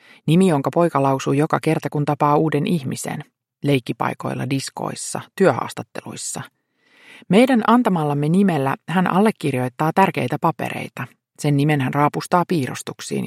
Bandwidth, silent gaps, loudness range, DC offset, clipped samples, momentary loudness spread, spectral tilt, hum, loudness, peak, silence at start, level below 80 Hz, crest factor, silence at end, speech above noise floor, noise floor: 15.5 kHz; none; 5 LU; under 0.1%; under 0.1%; 12 LU; -6 dB/octave; none; -20 LUFS; 0 dBFS; 0.25 s; -64 dBFS; 20 dB; 0 s; 36 dB; -55 dBFS